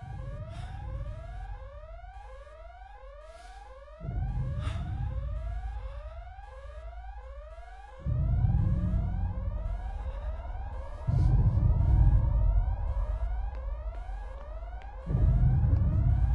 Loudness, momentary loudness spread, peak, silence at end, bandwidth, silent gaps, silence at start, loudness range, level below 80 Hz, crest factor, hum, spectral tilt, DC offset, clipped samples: -31 LUFS; 22 LU; -12 dBFS; 0 s; 4.2 kHz; none; 0 s; 14 LU; -32 dBFS; 18 dB; none; -9.5 dB/octave; under 0.1%; under 0.1%